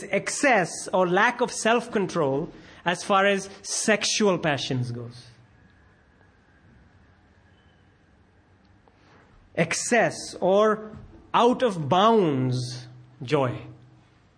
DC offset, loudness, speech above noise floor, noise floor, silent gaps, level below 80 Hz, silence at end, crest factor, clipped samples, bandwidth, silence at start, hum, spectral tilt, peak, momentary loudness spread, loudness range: under 0.1%; -23 LUFS; 35 dB; -59 dBFS; none; -62 dBFS; 0.65 s; 20 dB; under 0.1%; 10.5 kHz; 0 s; none; -4 dB/octave; -6 dBFS; 12 LU; 9 LU